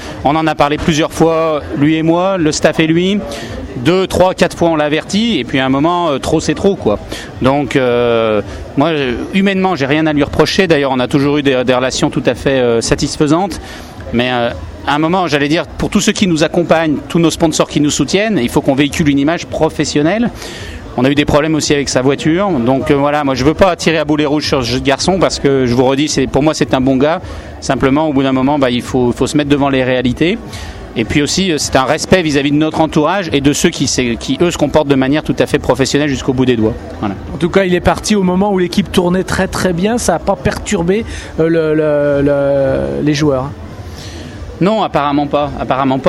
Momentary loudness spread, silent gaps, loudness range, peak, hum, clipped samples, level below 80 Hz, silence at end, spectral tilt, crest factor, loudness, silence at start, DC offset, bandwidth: 6 LU; none; 2 LU; 0 dBFS; none; 0.1%; -34 dBFS; 0 s; -5 dB/octave; 12 dB; -13 LUFS; 0 s; under 0.1%; 13 kHz